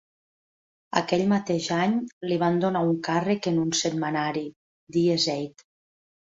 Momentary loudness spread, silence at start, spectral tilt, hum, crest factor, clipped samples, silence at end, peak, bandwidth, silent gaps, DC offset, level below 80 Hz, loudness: 6 LU; 0.95 s; -5 dB/octave; none; 20 dB; under 0.1%; 0.8 s; -6 dBFS; 7.8 kHz; 2.13-2.21 s, 4.56-4.87 s; under 0.1%; -66 dBFS; -25 LUFS